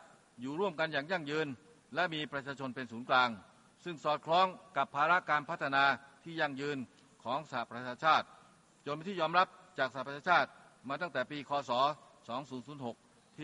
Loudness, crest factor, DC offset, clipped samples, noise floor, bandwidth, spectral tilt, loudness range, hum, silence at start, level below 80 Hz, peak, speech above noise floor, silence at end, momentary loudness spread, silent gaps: -34 LUFS; 22 dB; under 0.1%; under 0.1%; -63 dBFS; 11.5 kHz; -5 dB/octave; 3 LU; none; 0.05 s; -80 dBFS; -14 dBFS; 29 dB; 0 s; 16 LU; none